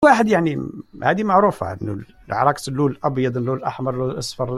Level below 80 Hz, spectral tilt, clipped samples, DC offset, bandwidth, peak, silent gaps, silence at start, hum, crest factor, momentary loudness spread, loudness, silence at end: -52 dBFS; -6 dB/octave; under 0.1%; under 0.1%; 13.5 kHz; -2 dBFS; none; 0 s; none; 18 dB; 12 LU; -20 LUFS; 0 s